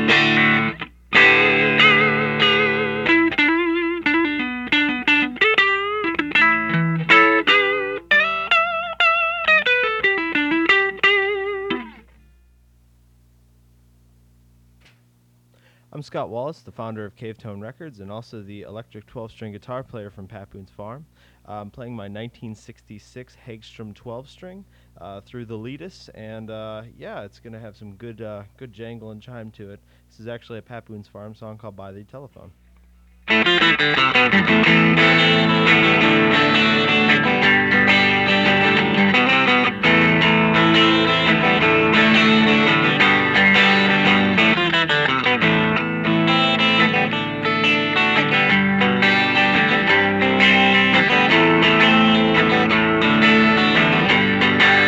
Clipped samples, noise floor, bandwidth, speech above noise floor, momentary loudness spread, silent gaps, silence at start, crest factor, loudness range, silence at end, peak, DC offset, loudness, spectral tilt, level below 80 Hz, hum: under 0.1%; -57 dBFS; 8 kHz; 31 dB; 22 LU; none; 0 s; 16 dB; 22 LU; 0 s; -2 dBFS; under 0.1%; -15 LUFS; -5.5 dB/octave; -52 dBFS; 60 Hz at -55 dBFS